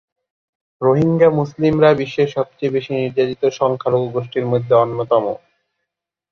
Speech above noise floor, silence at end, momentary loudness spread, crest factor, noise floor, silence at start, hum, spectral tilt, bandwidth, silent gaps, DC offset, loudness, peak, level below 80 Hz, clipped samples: 64 dB; 0.95 s; 8 LU; 16 dB; -80 dBFS; 0.8 s; none; -7.5 dB/octave; 6.8 kHz; none; under 0.1%; -17 LUFS; -2 dBFS; -52 dBFS; under 0.1%